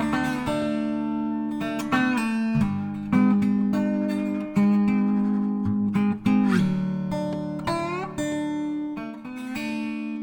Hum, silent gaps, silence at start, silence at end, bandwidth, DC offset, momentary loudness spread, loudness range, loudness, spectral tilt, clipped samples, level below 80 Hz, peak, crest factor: none; none; 0 s; 0 s; 17.5 kHz; under 0.1%; 9 LU; 4 LU; -25 LUFS; -7 dB/octave; under 0.1%; -52 dBFS; -8 dBFS; 16 dB